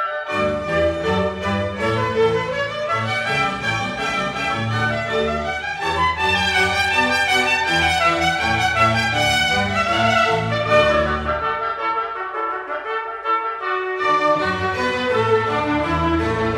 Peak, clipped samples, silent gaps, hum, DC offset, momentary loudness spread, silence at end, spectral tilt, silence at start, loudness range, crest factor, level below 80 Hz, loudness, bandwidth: -4 dBFS; under 0.1%; none; none; under 0.1%; 7 LU; 0 s; -4.5 dB/octave; 0 s; 4 LU; 16 dB; -40 dBFS; -19 LUFS; 16 kHz